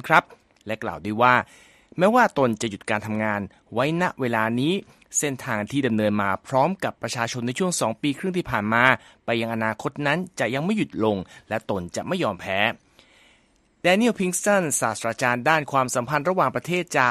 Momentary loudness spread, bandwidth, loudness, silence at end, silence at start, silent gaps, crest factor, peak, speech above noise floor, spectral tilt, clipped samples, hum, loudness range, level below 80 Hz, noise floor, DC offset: 10 LU; 13.5 kHz; -23 LUFS; 0 s; 0.05 s; none; 24 dB; 0 dBFS; 39 dB; -4.5 dB/octave; under 0.1%; none; 4 LU; -58 dBFS; -62 dBFS; under 0.1%